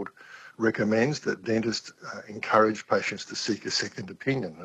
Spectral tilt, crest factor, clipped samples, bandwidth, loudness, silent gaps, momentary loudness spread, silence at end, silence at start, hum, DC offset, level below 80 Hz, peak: -4.5 dB/octave; 22 dB; under 0.1%; 8.8 kHz; -27 LUFS; none; 17 LU; 0 s; 0 s; none; under 0.1%; -68 dBFS; -6 dBFS